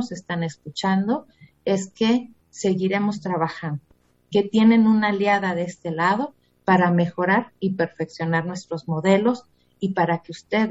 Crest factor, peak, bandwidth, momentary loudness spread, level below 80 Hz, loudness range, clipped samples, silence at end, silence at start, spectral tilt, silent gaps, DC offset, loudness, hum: 18 dB; -4 dBFS; 8 kHz; 12 LU; -64 dBFS; 4 LU; under 0.1%; 0 s; 0 s; -6.5 dB/octave; none; under 0.1%; -22 LUFS; none